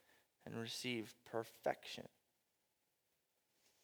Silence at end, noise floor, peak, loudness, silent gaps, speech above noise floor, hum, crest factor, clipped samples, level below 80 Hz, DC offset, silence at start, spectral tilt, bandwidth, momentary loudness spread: 1.75 s; -85 dBFS; -24 dBFS; -46 LUFS; none; 39 dB; none; 26 dB; under 0.1%; under -90 dBFS; under 0.1%; 0.45 s; -4 dB/octave; over 20 kHz; 10 LU